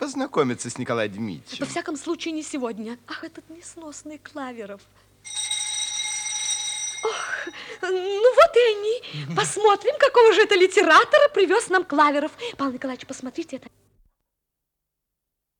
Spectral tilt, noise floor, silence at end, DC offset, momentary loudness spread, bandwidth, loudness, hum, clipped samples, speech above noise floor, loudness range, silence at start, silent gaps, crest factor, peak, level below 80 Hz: -2.5 dB/octave; -82 dBFS; 2 s; under 0.1%; 21 LU; 16 kHz; -21 LUFS; none; under 0.1%; 60 dB; 15 LU; 0 s; none; 18 dB; -4 dBFS; -64 dBFS